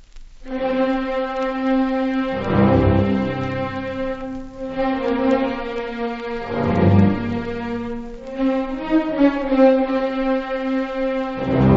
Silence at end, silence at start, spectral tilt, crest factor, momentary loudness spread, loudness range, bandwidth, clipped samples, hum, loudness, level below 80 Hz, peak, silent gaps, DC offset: 0 s; 0 s; -9 dB/octave; 16 dB; 11 LU; 3 LU; 7.2 kHz; under 0.1%; none; -20 LUFS; -38 dBFS; -2 dBFS; none; under 0.1%